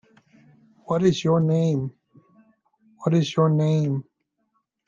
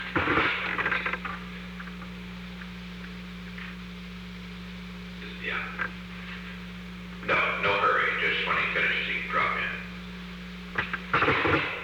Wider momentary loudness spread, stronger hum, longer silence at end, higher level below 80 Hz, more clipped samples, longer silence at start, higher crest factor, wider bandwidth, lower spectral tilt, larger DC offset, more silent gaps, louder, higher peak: second, 9 LU vs 16 LU; neither; first, 0.85 s vs 0 s; second, -64 dBFS vs -48 dBFS; neither; first, 0.9 s vs 0 s; about the same, 16 dB vs 18 dB; second, 7.4 kHz vs over 20 kHz; first, -7.5 dB/octave vs -5.5 dB/octave; neither; neither; first, -22 LUFS vs -27 LUFS; first, -8 dBFS vs -12 dBFS